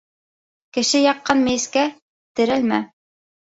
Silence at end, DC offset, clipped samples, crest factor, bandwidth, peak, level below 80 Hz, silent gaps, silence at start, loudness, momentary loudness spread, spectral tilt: 0.55 s; under 0.1%; under 0.1%; 18 dB; 8 kHz; -2 dBFS; -58 dBFS; 2.02-2.35 s; 0.75 s; -19 LUFS; 11 LU; -2.5 dB/octave